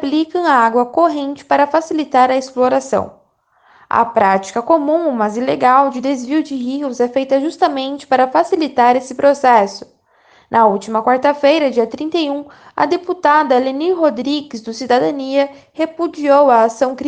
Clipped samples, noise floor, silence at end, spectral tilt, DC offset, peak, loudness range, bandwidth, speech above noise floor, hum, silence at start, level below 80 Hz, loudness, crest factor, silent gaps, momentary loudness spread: under 0.1%; -55 dBFS; 0 s; -4.5 dB/octave; under 0.1%; 0 dBFS; 2 LU; 9.4 kHz; 41 dB; none; 0 s; -62 dBFS; -15 LUFS; 14 dB; none; 9 LU